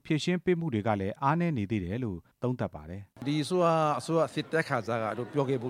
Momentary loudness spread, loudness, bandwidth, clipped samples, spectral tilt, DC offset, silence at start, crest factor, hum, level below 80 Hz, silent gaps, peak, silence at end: 9 LU; -30 LUFS; 14 kHz; under 0.1%; -6.5 dB/octave; under 0.1%; 0.05 s; 18 dB; none; -60 dBFS; none; -12 dBFS; 0 s